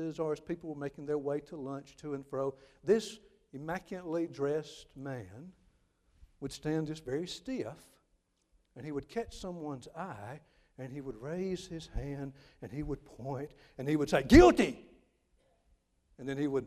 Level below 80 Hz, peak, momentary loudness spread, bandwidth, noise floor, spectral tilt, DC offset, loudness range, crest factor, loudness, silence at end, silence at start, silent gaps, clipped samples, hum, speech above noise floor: -48 dBFS; -6 dBFS; 15 LU; 14 kHz; -75 dBFS; -6 dB/octave; under 0.1%; 14 LU; 28 dB; -33 LUFS; 0 s; 0 s; none; under 0.1%; none; 42 dB